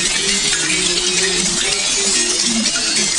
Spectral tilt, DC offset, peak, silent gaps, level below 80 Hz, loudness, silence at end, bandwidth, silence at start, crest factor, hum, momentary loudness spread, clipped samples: -0.5 dB/octave; under 0.1%; -2 dBFS; none; -40 dBFS; -14 LUFS; 0 s; 13 kHz; 0 s; 16 dB; none; 1 LU; under 0.1%